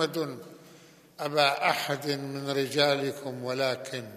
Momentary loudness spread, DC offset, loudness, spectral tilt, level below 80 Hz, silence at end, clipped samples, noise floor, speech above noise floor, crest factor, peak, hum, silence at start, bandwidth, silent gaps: 12 LU; under 0.1%; -28 LUFS; -4 dB/octave; -80 dBFS; 0 s; under 0.1%; -54 dBFS; 25 dB; 22 dB; -8 dBFS; none; 0 s; 15 kHz; none